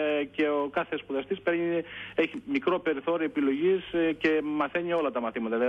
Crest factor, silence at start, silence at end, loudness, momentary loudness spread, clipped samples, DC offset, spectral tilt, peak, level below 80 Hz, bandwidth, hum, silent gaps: 14 dB; 0 s; 0 s; -28 LUFS; 5 LU; under 0.1%; under 0.1%; -7 dB/octave; -14 dBFS; -64 dBFS; 6.4 kHz; none; none